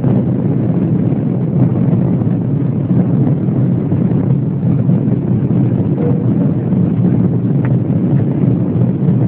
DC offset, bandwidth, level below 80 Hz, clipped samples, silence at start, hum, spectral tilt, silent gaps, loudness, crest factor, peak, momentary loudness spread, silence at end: under 0.1%; 3.4 kHz; -40 dBFS; under 0.1%; 0 s; none; -14.5 dB/octave; none; -14 LUFS; 12 dB; 0 dBFS; 2 LU; 0 s